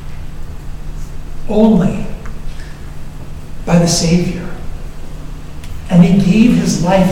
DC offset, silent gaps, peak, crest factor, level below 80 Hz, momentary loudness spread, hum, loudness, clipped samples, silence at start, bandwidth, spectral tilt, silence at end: under 0.1%; none; 0 dBFS; 14 dB; -26 dBFS; 22 LU; none; -12 LUFS; 0.3%; 0 s; 13.5 kHz; -6 dB/octave; 0 s